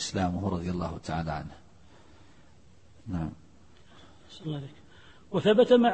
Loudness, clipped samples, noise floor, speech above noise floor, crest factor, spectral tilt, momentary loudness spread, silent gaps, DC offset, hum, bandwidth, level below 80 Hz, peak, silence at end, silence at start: -29 LUFS; under 0.1%; -58 dBFS; 31 dB; 20 dB; -6 dB/octave; 23 LU; none; 0.2%; none; 8.8 kHz; -52 dBFS; -8 dBFS; 0 s; 0 s